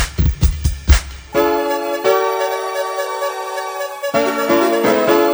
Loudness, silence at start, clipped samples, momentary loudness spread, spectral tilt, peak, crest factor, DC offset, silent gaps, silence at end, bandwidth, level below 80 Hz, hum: -17 LUFS; 0 s; under 0.1%; 8 LU; -5.5 dB/octave; 0 dBFS; 16 dB; under 0.1%; none; 0 s; over 20 kHz; -24 dBFS; none